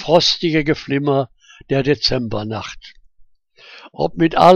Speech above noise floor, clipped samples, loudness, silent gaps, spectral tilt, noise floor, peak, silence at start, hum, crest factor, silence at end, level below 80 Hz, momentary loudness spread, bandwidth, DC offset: 33 dB; under 0.1%; -18 LUFS; none; -5.5 dB/octave; -49 dBFS; 0 dBFS; 0 s; none; 18 dB; 0 s; -42 dBFS; 16 LU; 10 kHz; under 0.1%